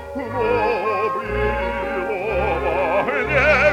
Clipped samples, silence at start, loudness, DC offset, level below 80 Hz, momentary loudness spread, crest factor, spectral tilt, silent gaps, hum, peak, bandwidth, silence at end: under 0.1%; 0 s; -20 LUFS; under 0.1%; -34 dBFS; 7 LU; 16 dB; -6 dB/octave; none; none; -4 dBFS; 15 kHz; 0 s